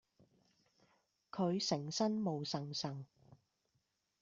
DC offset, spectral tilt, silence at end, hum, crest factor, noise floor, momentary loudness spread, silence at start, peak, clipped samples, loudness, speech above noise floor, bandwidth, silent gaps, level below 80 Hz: under 0.1%; -5 dB/octave; 1.15 s; none; 20 dB; -83 dBFS; 14 LU; 1.35 s; -22 dBFS; under 0.1%; -39 LUFS; 45 dB; 7.8 kHz; none; -80 dBFS